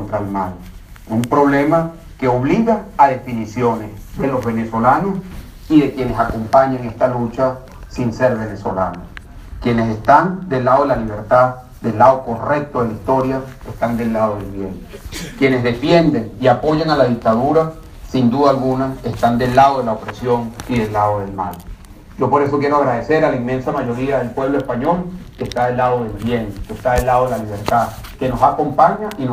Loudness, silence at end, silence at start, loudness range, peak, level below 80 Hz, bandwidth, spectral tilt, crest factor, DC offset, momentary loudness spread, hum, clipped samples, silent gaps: -17 LUFS; 0 s; 0 s; 4 LU; 0 dBFS; -36 dBFS; 15.5 kHz; -7 dB/octave; 16 dB; under 0.1%; 12 LU; none; under 0.1%; none